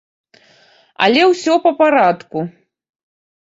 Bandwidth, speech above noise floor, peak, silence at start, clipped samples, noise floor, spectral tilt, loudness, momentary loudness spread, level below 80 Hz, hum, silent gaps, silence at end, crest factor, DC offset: 8 kHz; 38 dB; 0 dBFS; 1 s; under 0.1%; -51 dBFS; -4.5 dB/octave; -14 LUFS; 13 LU; -64 dBFS; none; none; 0.9 s; 16 dB; under 0.1%